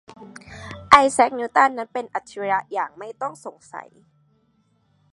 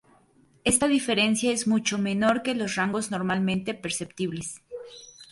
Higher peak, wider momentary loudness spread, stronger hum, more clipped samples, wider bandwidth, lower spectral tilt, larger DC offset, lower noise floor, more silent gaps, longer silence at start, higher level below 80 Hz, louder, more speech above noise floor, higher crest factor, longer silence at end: first, 0 dBFS vs -6 dBFS; first, 25 LU vs 16 LU; neither; neither; about the same, 11.5 kHz vs 12 kHz; about the same, -3 dB/octave vs -3.5 dB/octave; neither; about the same, -64 dBFS vs -61 dBFS; neither; second, 0.2 s vs 0.65 s; about the same, -56 dBFS vs -58 dBFS; first, -20 LUFS vs -25 LUFS; first, 42 dB vs 35 dB; about the same, 22 dB vs 20 dB; first, 1.3 s vs 0.1 s